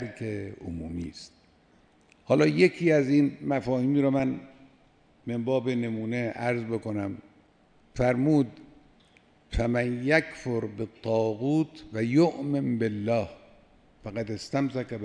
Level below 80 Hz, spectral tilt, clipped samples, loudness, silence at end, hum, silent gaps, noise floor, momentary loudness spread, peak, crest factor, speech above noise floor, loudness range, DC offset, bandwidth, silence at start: -48 dBFS; -7.5 dB/octave; under 0.1%; -27 LUFS; 0 s; none; none; -61 dBFS; 14 LU; -8 dBFS; 20 dB; 35 dB; 5 LU; under 0.1%; 10 kHz; 0 s